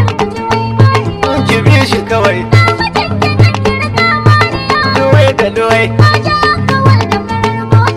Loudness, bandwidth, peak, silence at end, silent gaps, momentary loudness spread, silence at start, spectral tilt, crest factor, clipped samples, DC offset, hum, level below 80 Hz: -10 LUFS; 12 kHz; 0 dBFS; 0 s; none; 5 LU; 0 s; -6 dB/octave; 10 dB; 3%; under 0.1%; none; -32 dBFS